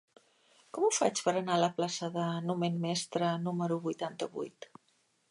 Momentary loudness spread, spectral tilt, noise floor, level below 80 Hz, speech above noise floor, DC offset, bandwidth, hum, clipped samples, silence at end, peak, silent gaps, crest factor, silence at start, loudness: 12 LU; -4.5 dB/octave; -73 dBFS; -84 dBFS; 41 dB; under 0.1%; 11.5 kHz; none; under 0.1%; 0.65 s; -14 dBFS; none; 20 dB; 0.75 s; -33 LUFS